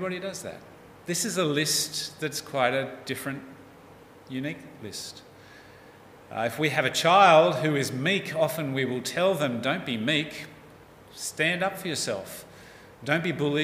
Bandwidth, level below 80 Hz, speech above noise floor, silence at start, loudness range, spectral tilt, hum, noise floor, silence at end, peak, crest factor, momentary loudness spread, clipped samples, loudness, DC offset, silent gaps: 16 kHz; -68 dBFS; 24 dB; 0 s; 11 LU; -3.5 dB/octave; none; -50 dBFS; 0 s; -4 dBFS; 22 dB; 18 LU; under 0.1%; -26 LUFS; under 0.1%; none